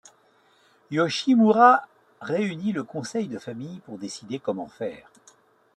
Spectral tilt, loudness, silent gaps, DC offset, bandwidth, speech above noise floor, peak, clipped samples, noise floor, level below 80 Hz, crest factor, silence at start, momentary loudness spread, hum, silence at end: -5.5 dB/octave; -23 LUFS; none; under 0.1%; 11 kHz; 38 dB; -4 dBFS; under 0.1%; -61 dBFS; -74 dBFS; 22 dB; 0.9 s; 20 LU; none; 0.8 s